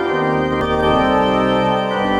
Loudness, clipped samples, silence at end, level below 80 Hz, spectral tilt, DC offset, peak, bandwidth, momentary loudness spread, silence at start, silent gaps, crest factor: -16 LUFS; under 0.1%; 0 s; -36 dBFS; -6.5 dB/octave; under 0.1%; -4 dBFS; 12 kHz; 3 LU; 0 s; none; 12 dB